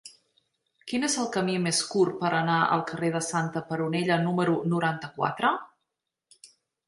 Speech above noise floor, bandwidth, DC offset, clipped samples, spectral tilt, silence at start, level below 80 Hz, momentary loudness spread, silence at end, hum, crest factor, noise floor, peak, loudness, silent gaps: 57 dB; 11.5 kHz; under 0.1%; under 0.1%; -4.5 dB/octave; 0.05 s; -72 dBFS; 6 LU; 0.4 s; none; 18 dB; -83 dBFS; -8 dBFS; -27 LUFS; none